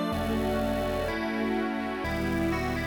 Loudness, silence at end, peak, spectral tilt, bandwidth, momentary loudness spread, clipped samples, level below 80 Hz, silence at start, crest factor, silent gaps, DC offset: -29 LUFS; 0 s; -16 dBFS; -6 dB/octave; 19 kHz; 2 LU; under 0.1%; -40 dBFS; 0 s; 12 dB; none; under 0.1%